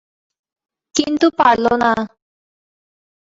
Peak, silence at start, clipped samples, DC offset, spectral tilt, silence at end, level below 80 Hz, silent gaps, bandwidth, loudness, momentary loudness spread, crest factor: -2 dBFS; 0.95 s; under 0.1%; under 0.1%; -3.5 dB/octave; 1.25 s; -54 dBFS; none; 8 kHz; -16 LUFS; 9 LU; 18 dB